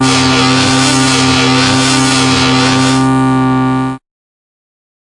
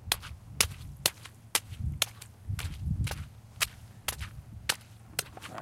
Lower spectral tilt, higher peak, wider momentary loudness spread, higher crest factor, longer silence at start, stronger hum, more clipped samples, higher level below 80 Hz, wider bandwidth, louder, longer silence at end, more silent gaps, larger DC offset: first, -4 dB/octave vs -2 dB/octave; first, 0 dBFS vs -4 dBFS; second, 4 LU vs 14 LU; second, 10 dB vs 30 dB; about the same, 0 s vs 0 s; neither; neither; first, -38 dBFS vs -46 dBFS; second, 11.5 kHz vs 16.5 kHz; first, -9 LUFS vs -33 LUFS; first, 1.15 s vs 0 s; neither; first, 0.2% vs under 0.1%